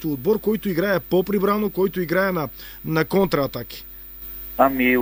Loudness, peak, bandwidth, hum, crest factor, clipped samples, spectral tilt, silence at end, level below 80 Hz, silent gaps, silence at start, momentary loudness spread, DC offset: -21 LUFS; -2 dBFS; over 20 kHz; none; 20 dB; under 0.1%; -6.5 dB/octave; 0 s; -46 dBFS; none; 0 s; 14 LU; under 0.1%